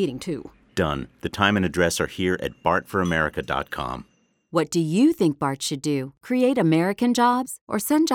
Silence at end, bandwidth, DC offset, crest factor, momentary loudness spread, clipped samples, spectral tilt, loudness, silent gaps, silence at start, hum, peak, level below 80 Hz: 0 s; 18 kHz; under 0.1%; 20 dB; 11 LU; under 0.1%; -5 dB/octave; -23 LUFS; 7.61-7.67 s; 0 s; none; -2 dBFS; -48 dBFS